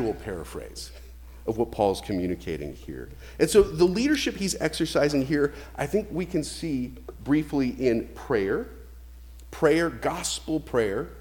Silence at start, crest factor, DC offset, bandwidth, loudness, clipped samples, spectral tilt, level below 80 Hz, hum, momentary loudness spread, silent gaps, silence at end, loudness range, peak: 0 s; 22 dB; under 0.1%; 19.5 kHz; -26 LUFS; under 0.1%; -5 dB/octave; -44 dBFS; none; 17 LU; none; 0 s; 4 LU; -6 dBFS